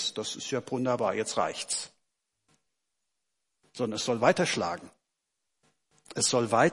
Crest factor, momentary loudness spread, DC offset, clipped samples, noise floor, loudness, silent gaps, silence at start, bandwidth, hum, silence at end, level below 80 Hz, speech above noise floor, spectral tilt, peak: 24 dB; 12 LU; under 0.1%; under 0.1%; -84 dBFS; -29 LUFS; none; 0 s; 11.5 kHz; none; 0 s; -74 dBFS; 56 dB; -3.5 dB/octave; -8 dBFS